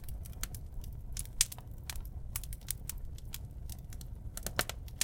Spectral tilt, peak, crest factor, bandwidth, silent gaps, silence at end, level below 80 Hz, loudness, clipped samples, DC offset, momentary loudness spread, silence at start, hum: -2 dB/octave; -4 dBFS; 36 dB; 17 kHz; none; 0 s; -44 dBFS; -40 LUFS; under 0.1%; under 0.1%; 14 LU; 0 s; none